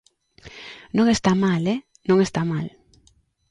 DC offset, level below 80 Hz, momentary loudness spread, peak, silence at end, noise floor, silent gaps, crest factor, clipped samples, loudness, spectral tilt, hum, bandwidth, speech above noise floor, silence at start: under 0.1%; -52 dBFS; 20 LU; -6 dBFS; 0.8 s; -61 dBFS; none; 18 dB; under 0.1%; -21 LUFS; -6 dB/octave; none; 11 kHz; 41 dB; 0.45 s